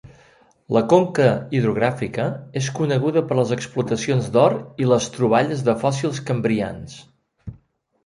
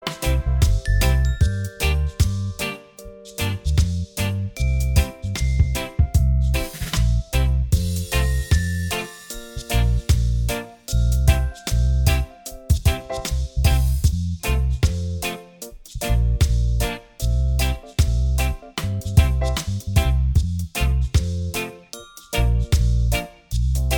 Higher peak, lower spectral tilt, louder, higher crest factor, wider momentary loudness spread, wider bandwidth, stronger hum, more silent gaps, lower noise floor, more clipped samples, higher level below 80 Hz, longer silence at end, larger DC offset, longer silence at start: about the same, -2 dBFS vs -2 dBFS; first, -6.5 dB/octave vs -5 dB/octave; about the same, -20 LUFS vs -22 LUFS; about the same, 18 dB vs 18 dB; about the same, 10 LU vs 9 LU; second, 11.5 kHz vs over 20 kHz; neither; neither; first, -56 dBFS vs -41 dBFS; neither; second, -54 dBFS vs -22 dBFS; first, 0.55 s vs 0 s; neither; about the same, 0.05 s vs 0 s